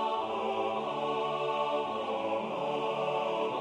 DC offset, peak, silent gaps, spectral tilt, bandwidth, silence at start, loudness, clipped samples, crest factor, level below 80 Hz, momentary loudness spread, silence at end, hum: under 0.1%; -20 dBFS; none; -5 dB/octave; 11 kHz; 0 s; -32 LUFS; under 0.1%; 12 dB; -76 dBFS; 2 LU; 0 s; none